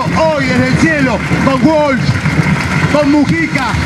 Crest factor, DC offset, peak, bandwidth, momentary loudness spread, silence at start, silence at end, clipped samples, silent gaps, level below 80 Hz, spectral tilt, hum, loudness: 12 dB; under 0.1%; 0 dBFS; 13 kHz; 3 LU; 0 s; 0 s; under 0.1%; none; -30 dBFS; -6 dB/octave; none; -11 LUFS